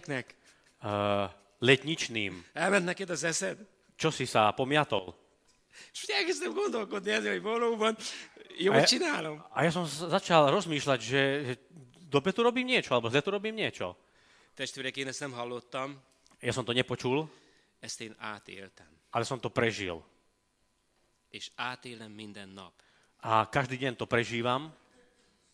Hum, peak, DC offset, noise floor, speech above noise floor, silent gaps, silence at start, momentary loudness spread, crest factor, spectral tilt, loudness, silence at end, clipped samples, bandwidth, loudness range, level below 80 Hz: none; -6 dBFS; under 0.1%; -74 dBFS; 43 dB; none; 0.05 s; 18 LU; 26 dB; -4 dB/octave; -30 LUFS; 0.85 s; under 0.1%; 13.5 kHz; 9 LU; -70 dBFS